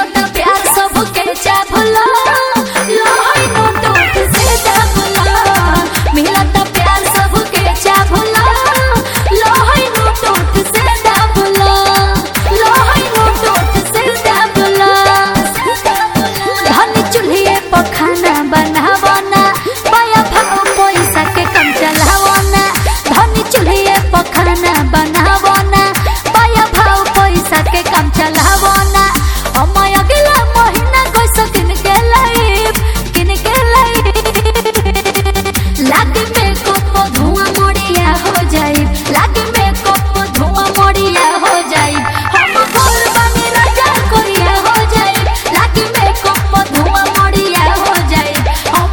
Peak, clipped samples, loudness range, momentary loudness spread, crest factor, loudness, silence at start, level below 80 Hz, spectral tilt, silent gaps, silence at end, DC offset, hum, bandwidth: 0 dBFS; 0.6%; 2 LU; 4 LU; 10 dB; -9 LUFS; 0 s; -18 dBFS; -4 dB/octave; none; 0 s; under 0.1%; none; over 20 kHz